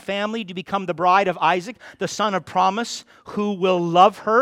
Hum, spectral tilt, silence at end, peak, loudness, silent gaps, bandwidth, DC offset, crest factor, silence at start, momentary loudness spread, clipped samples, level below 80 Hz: none; -4.5 dB/octave; 0 s; -2 dBFS; -20 LUFS; none; 14.5 kHz; under 0.1%; 18 dB; 0.1 s; 14 LU; under 0.1%; -64 dBFS